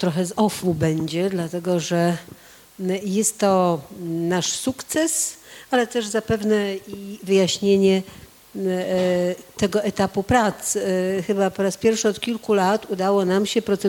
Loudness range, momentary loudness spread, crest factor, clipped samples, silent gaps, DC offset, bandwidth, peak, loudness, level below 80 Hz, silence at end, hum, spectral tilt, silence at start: 2 LU; 8 LU; 16 dB; under 0.1%; none; under 0.1%; 18.5 kHz; -6 dBFS; -21 LUFS; -52 dBFS; 0 s; none; -4.5 dB/octave; 0 s